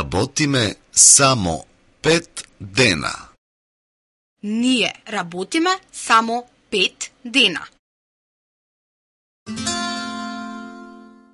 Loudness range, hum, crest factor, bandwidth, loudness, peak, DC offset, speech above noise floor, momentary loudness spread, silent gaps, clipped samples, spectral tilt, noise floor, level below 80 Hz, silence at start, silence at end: 12 LU; none; 22 dB; 13.5 kHz; -17 LUFS; 0 dBFS; under 0.1%; 24 dB; 20 LU; 3.38-4.36 s, 7.79-9.46 s; under 0.1%; -2 dB/octave; -43 dBFS; -46 dBFS; 0 s; 0.35 s